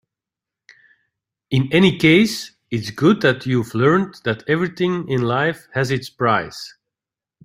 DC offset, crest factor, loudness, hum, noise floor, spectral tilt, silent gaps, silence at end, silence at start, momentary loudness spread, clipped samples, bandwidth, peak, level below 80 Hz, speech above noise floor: under 0.1%; 18 dB; -18 LUFS; none; -88 dBFS; -6 dB/octave; none; 0.75 s; 1.5 s; 13 LU; under 0.1%; 16 kHz; -2 dBFS; -54 dBFS; 70 dB